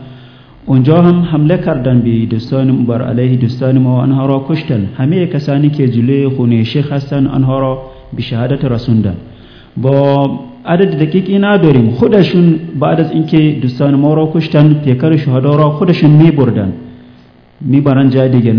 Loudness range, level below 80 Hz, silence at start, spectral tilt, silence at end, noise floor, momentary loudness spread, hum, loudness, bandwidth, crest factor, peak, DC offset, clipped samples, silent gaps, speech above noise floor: 4 LU; -40 dBFS; 0 s; -10 dB/octave; 0 s; -41 dBFS; 8 LU; none; -11 LUFS; 5.4 kHz; 10 dB; 0 dBFS; under 0.1%; 0.9%; none; 31 dB